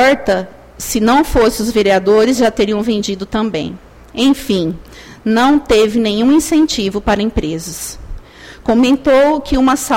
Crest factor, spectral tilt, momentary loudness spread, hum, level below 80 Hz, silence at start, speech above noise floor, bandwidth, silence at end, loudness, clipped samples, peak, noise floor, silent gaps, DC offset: 12 dB; -4.5 dB/octave; 13 LU; none; -32 dBFS; 0 s; 22 dB; 16.5 kHz; 0 s; -13 LUFS; under 0.1%; -2 dBFS; -35 dBFS; none; under 0.1%